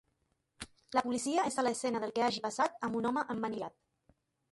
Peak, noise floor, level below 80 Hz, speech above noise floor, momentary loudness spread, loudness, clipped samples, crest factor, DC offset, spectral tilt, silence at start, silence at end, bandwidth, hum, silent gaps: -16 dBFS; -79 dBFS; -72 dBFS; 45 dB; 13 LU; -34 LUFS; under 0.1%; 20 dB; under 0.1%; -3.5 dB/octave; 0.6 s; 0.85 s; 11.5 kHz; none; none